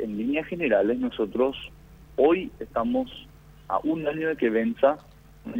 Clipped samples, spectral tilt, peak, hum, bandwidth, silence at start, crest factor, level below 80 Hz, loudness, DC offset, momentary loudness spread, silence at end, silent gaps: under 0.1%; -7.5 dB/octave; -8 dBFS; none; 16 kHz; 0 s; 18 dB; -52 dBFS; -25 LUFS; under 0.1%; 14 LU; 0 s; none